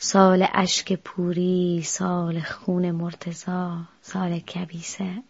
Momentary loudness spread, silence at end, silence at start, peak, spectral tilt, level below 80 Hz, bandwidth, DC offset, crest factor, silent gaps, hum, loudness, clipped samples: 14 LU; 0.1 s; 0 s; -2 dBFS; -5 dB/octave; -62 dBFS; 8 kHz; under 0.1%; 22 dB; none; none; -24 LUFS; under 0.1%